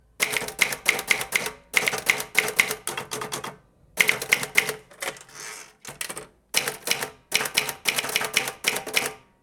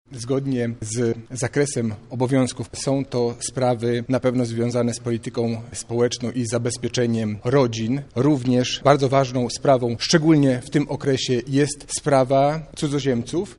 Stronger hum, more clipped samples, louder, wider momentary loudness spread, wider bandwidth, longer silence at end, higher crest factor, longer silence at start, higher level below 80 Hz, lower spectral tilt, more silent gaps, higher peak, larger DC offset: neither; neither; about the same, -24 LUFS vs -22 LUFS; first, 13 LU vs 8 LU; first, over 20 kHz vs 11.5 kHz; first, 0.25 s vs 0.05 s; first, 26 dB vs 20 dB; about the same, 0.2 s vs 0.1 s; second, -62 dBFS vs -50 dBFS; second, 0 dB/octave vs -5.5 dB/octave; neither; about the same, -2 dBFS vs 0 dBFS; neither